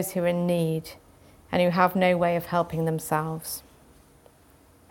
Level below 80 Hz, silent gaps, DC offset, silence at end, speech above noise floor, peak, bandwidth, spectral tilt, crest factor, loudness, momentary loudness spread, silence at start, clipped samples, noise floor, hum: -58 dBFS; none; under 0.1%; 1.3 s; 32 dB; -6 dBFS; 17.5 kHz; -6 dB/octave; 22 dB; -25 LUFS; 12 LU; 0 s; under 0.1%; -56 dBFS; none